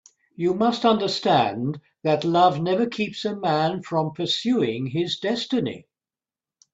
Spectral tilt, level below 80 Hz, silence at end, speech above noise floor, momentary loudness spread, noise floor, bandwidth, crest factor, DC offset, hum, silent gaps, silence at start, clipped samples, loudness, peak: -6 dB/octave; -64 dBFS; 0.95 s; over 67 dB; 8 LU; under -90 dBFS; 8 kHz; 18 dB; under 0.1%; none; none; 0.4 s; under 0.1%; -23 LUFS; -4 dBFS